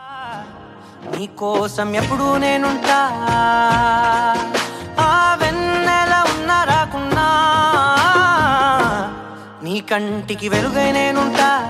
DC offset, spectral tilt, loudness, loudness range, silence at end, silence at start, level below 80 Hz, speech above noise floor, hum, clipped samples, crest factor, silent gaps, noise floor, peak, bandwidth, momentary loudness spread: under 0.1%; -4 dB/octave; -16 LUFS; 3 LU; 0 s; 0 s; -42 dBFS; 21 dB; none; under 0.1%; 16 dB; none; -38 dBFS; -2 dBFS; 16 kHz; 14 LU